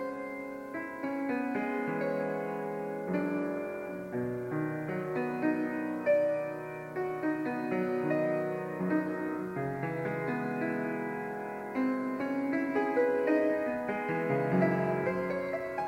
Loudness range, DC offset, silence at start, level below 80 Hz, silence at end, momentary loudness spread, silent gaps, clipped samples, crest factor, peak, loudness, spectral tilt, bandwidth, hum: 4 LU; under 0.1%; 0 s; -68 dBFS; 0 s; 9 LU; none; under 0.1%; 16 dB; -16 dBFS; -33 LUFS; -8.5 dB/octave; 16.5 kHz; none